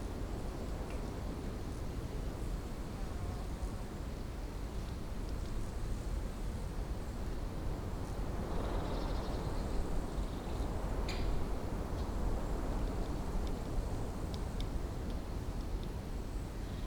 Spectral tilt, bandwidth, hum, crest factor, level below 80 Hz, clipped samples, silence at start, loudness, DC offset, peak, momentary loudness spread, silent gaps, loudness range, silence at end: -6.5 dB/octave; 19.5 kHz; none; 16 dB; -40 dBFS; under 0.1%; 0 s; -41 LUFS; under 0.1%; -22 dBFS; 4 LU; none; 3 LU; 0 s